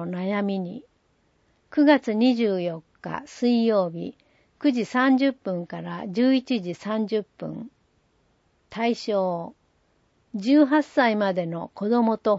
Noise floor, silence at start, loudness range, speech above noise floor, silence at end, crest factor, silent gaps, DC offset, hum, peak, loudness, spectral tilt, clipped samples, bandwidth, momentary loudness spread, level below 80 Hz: -66 dBFS; 0 s; 6 LU; 43 dB; 0 s; 18 dB; none; under 0.1%; none; -6 dBFS; -24 LUFS; -6.5 dB/octave; under 0.1%; 8 kHz; 16 LU; -70 dBFS